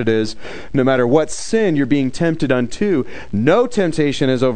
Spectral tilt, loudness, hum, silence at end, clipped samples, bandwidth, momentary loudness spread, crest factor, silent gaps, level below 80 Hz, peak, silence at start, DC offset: -6 dB/octave; -17 LUFS; none; 0 s; under 0.1%; 9.4 kHz; 6 LU; 16 dB; none; -42 dBFS; 0 dBFS; 0 s; 4%